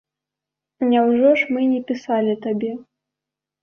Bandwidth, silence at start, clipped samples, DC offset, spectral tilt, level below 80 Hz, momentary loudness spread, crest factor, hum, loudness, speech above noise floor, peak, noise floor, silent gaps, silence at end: 6.6 kHz; 0.8 s; under 0.1%; under 0.1%; -7 dB/octave; -68 dBFS; 10 LU; 16 dB; none; -19 LUFS; 68 dB; -4 dBFS; -86 dBFS; none; 0.8 s